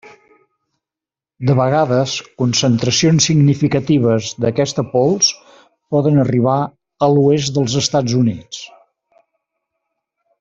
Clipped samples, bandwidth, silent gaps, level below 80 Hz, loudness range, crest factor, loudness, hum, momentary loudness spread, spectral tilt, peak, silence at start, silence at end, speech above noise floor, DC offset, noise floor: under 0.1%; 7.8 kHz; none; -52 dBFS; 3 LU; 14 dB; -15 LUFS; none; 8 LU; -5 dB/octave; -2 dBFS; 0.05 s; 1.75 s; 74 dB; under 0.1%; -88 dBFS